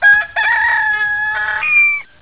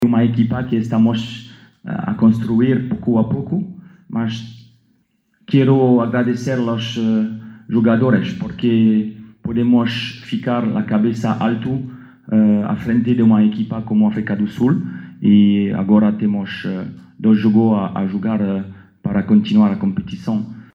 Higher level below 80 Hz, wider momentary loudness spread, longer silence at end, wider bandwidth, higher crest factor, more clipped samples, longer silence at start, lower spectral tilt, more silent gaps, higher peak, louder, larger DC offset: about the same, -50 dBFS vs -54 dBFS; second, 6 LU vs 12 LU; about the same, 0.2 s vs 0.1 s; second, 4 kHz vs 6.8 kHz; about the same, 12 dB vs 14 dB; neither; about the same, 0 s vs 0 s; second, -4 dB/octave vs -8.5 dB/octave; neither; about the same, -2 dBFS vs -2 dBFS; first, -12 LUFS vs -17 LUFS; neither